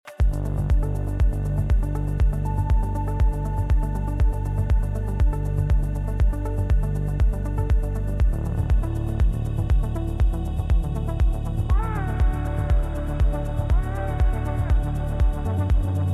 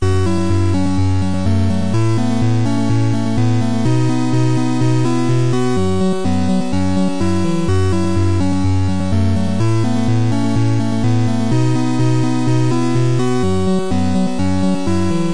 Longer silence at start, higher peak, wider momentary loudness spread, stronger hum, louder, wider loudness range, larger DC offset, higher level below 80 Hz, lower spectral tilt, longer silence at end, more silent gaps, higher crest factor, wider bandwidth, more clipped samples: about the same, 0.05 s vs 0 s; second, -12 dBFS vs -4 dBFS; about the same, 3 LU vs 2 LU; neither; second, -25 LUFS vs -16 LUFS; about the same, 0 LU vs 1 LU; second, under 0.1% vs 10%; first, -22 dBFS vs -40 dBFS; first, -8.5 dB/octave vs -7 dB/octave; about the same, 0 s vs 0 s; neither; about the same, 10 dB vs 10 dB; first, 12 kHz vs 10.5 kHz; neither